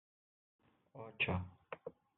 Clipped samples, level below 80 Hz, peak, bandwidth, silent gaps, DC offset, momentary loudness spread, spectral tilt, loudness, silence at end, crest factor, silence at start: under 0.1%; -74 dBFS; -24 dBFS; 4 kHz; none; under 0.1%; 17 LU; -3.5 dB/octave; -41 LUFS; 0.25 s; 22 dB; 0.95 s